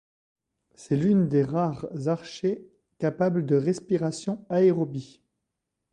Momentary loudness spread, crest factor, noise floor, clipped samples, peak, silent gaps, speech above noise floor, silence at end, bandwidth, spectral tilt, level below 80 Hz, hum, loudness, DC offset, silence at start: 9 LU; 16 dB; -83 dBFS; under 0.1%; -10 dBFS; none; 58 dB; 0.85 s; 10 kHz; -7.5 dB/octave; -64 dBFS; none; -26 LUFS; under 0.1%; 0.8 s